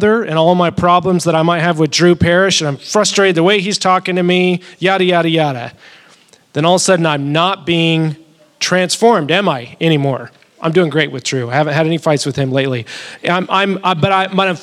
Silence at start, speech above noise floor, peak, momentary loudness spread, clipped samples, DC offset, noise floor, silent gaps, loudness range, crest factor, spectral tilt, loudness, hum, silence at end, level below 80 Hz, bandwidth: 0 s; 34 dB; 0 dBFS; 8 LU; under 0.1%; under 0.1%; -47 dBFS; none; 3 LU; 14 dB; -4.5 dB/octave; -13 LUFS; none; 0 s; -48 dBFS; 13.5 kHz